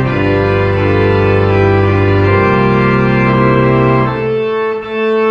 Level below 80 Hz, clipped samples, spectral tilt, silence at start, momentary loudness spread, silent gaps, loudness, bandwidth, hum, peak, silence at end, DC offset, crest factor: -32 dBFS; under 0.1%; -9 dB/octave; 0 s; 5 LU; none; -11 LUFS; 6.6 kHz; none; 0 dBFS; 0 s; under 0.1%; 10 dB